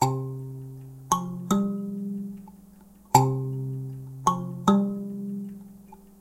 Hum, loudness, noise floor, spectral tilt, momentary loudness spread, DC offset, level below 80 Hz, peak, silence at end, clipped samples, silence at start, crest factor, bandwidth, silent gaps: none; -27 LUFS; -52 dBFS; -6 dB/octave; 18 LU; under 0.1%; -58 dBFS; -4 dBFS; 0.1 s; under 0.1%; 0 s; 24 dB; 16 kHz; none